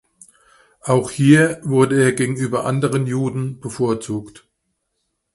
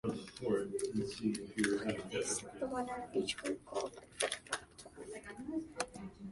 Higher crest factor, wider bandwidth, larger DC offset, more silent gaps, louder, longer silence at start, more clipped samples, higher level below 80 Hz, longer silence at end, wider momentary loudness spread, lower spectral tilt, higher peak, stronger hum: second, 18 dB vs 24 dB; about the same, 11.5 kHz vs 11.5 kHz; neither; neither; first, -18 LUFS vs -39 LUFS; first, 0.85 s vs 0.05 s; neither; first, -56 dBFS vs -66 dBFS; first, 0.95 s vs 0 s; about the same, 13 LU vs 11 LU; first, -6.5 dB/octave vs -3.5 dB/octave; first, 0 dBFS vs -16 dBFS; neither